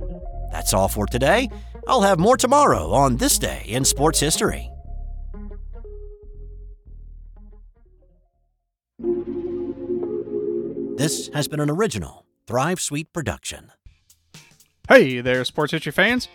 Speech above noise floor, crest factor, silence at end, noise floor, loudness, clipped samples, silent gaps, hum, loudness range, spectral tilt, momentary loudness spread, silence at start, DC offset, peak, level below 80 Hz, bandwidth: 55 dB; 22 dB; 0.1 s; -75 dBFS; -20 LUFS; under 0.1%; none; none; 15 LU; -4 dB/octave; 22 LU; 0 s; under 0.1%; 0 dBFS; -36 dBFS; 19 kHz